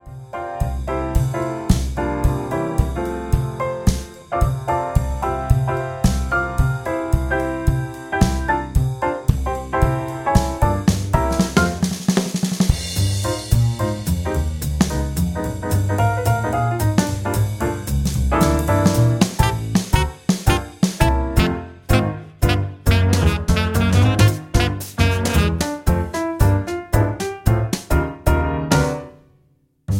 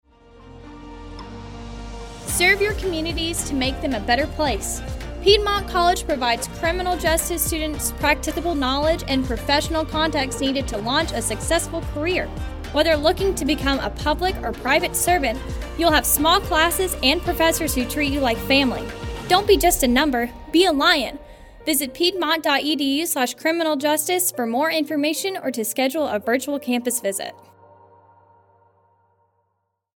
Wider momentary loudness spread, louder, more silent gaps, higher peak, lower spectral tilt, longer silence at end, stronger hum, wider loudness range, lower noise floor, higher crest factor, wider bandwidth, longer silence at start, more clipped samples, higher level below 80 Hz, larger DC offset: second, 6 LU vs 12 LU; about the same, -20 LUFS vs -20 LUFS; neither; about the same, 0 dBFS vs -2 dBFS; first, -6 dB/octave vs -3 dB/octave; second, 0 s vs 2.6 s; neither; about the same, 4 LU vs 5 LU; second, -59 dBFS vs -74 dBFS; about the same, 18 dB vs 20 dB; about the same, 17 kHz vs 17.5 kHz; second, 0.05 s vs 0.35 s; neither; first, -26 dBFS vs -34 dBFS; neither